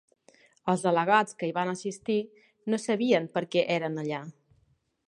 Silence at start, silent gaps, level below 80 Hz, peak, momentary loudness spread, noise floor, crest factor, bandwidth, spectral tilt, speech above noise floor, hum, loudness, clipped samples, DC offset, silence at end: 0.65 s; none; -76 dBFS; -8 dBFS; 12 LU; -69 dBFS; 22 dB; 11.5 kHz; -5 dB/octave; 42 dB; none; -28 LUFS; under 0.1%; under 0.1%; 0.75 s